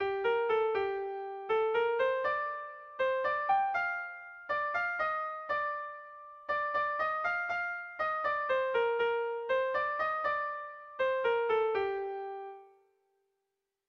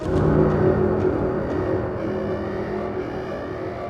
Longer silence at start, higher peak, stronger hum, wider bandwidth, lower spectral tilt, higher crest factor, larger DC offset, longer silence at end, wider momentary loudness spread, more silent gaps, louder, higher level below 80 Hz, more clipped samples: about the same, 0 s vs 0 s; second, -18 dBFS vs -6 dBFS; neither; second, 6.4 kHz vs 7.4 kHz; second, -4.5 dB/octave vs -9.5 dB/octave; about the same, 14 dB vs 16 dB; neither; first, 1.25 s vs 0 s; about the same, 12 LU vs 11 LU; neither; second, -32 LUFS vs -23 LUFS; second, -70 dBFS vs -38 dBFS; neither